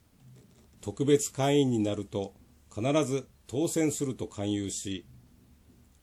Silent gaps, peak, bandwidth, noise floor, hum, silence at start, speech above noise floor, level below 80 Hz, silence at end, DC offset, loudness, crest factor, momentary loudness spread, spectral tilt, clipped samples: none; -12 dBFS; 15 kHz; -59 dBFS; none; 0.25 s; 30 dB; -62 dBFS; 0.85 s; under 0.1%; -30 LUFS; 20 dB; 14 LU; -5 dB/octave; under 0.1%